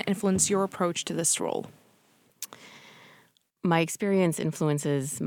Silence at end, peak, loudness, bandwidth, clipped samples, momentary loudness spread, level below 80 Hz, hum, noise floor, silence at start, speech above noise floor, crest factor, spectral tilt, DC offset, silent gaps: 0 s; -10 dBFS; -27 LUFS; 19 kHz; under 0.1%; 17 LU; -64 dBFS; none; -64 dBFS; 0 s; 37 dB; 20 dB; -4.5 dB/octave; under 0.1%; none